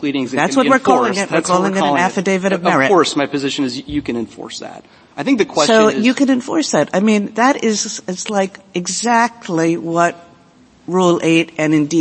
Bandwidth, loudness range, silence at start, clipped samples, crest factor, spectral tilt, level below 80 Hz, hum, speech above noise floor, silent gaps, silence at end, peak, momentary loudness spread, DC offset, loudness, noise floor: 8.8 kHz; 3 LU; 0 s; under 0.1%; 16 dB; -4.5 dB/octave; -52 dBFS; none; 33 dB; none; 0 s; 0 dBFS; 11 LU; under 0.1%; -15 LUFS; -48 dBFS